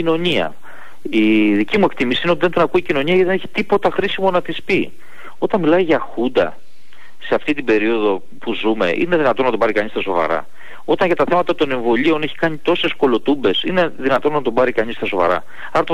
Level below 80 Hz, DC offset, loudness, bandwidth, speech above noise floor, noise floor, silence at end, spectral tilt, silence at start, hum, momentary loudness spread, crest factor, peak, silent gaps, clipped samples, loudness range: -50 dBFS; 6%; -17 LUFS; 12 kHz; 32 dB; -49 dBFS; 0 s; -6.5 dB/octave; 0 s; none; 6 LU; 12 dB; -6 dBFS; none; under 0.1%; 2 LU